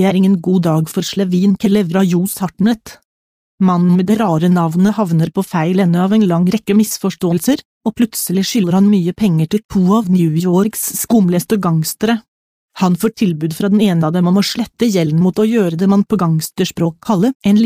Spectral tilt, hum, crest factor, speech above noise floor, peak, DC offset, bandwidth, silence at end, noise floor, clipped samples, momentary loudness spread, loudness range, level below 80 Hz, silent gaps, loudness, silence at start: -6.5 dB/octave; none; 10 dB; over 77 dB; -2 dBFS; under 0.1%; 15.5 kHz; 0 s; under -90 dBFS; under 0.1%; 5 LU; 2 LU; -50 dBFS; 3.05-3.58 s, 7.65-7.81 s, 9.65-9.69 s, 12.28-12.69 s, 17.35-17.40 s; -14 LUFS; 0 s